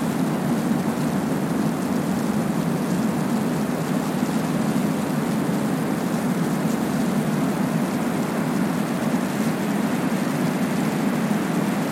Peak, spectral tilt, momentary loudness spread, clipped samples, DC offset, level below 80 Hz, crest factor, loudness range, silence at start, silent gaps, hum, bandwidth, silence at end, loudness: -10 dBFS; -6 dB/octave; 1 LU; under 0.1%; under 0.1%; -54 dBFS; 12 dB; 0 LU; 0 s; none; none; 16.5 kHz; 0 s; -23 LUFS